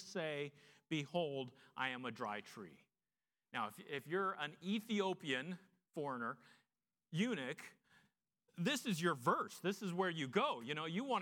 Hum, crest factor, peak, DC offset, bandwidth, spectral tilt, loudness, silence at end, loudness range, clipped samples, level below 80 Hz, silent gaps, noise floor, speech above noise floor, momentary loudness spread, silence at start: none; 22 dB; -20 dBFS; under 0.1%; 18 kHz; -5 dB/octave; -42 LUFS; 0 s; 5 LU; under 0.1%; under -90 dBFS; none; under -90 dBFS; over 48 dB; 13 LU; 0 s